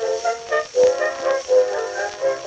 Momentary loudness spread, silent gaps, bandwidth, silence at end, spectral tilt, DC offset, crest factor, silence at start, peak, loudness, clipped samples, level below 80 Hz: 6 LU; none; 8.6 kHz; 0 s; -1.5 dB/octave; under 0.1%; 14 dB; 0 s; -6 dBFS; -20 LUFS; under 0.1%; -60 dBFS